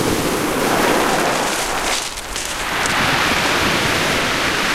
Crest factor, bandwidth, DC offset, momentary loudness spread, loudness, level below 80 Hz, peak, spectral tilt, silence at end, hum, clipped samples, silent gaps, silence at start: 16 dB; 16.5 kHz; under 0.1%; 6 LU; -17 LUFS; -36 dBFS; -2 dBFS; -2.5 dB/octave; 0 s; none; under 0.1%; none; 0 s